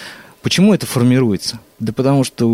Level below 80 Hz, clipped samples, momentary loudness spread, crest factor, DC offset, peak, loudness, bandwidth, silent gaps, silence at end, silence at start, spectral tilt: -52 dBFS; under 0.1%; 13 LU; 12 dB; under 0.1%; -4 dBFS; -15 LUFS; 16 kHz; none; 0 s; 0 s; -5.5 dB/octave